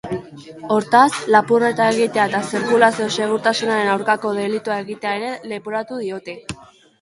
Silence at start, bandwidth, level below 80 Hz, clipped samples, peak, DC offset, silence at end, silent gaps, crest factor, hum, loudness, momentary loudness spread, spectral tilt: 0.05 s; 11.5 kHz; -60 dBFS; under 0.1%; 0 dBFS; under 0.1%; 0.35 s; none; 18 dB; none; -18 LUFS; 16 LU; -4 dB/octave